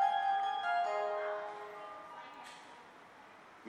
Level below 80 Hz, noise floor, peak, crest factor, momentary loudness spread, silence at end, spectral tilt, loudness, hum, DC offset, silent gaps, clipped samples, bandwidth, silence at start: -86 dBFS; -57 dBFS; -20 dBFS; 18 dB; 22 LU; 0 s; -2 dB/octave; -36 LUFS; none; under 0.1%; none; under 0.1%; 10.5 kHz; 0 s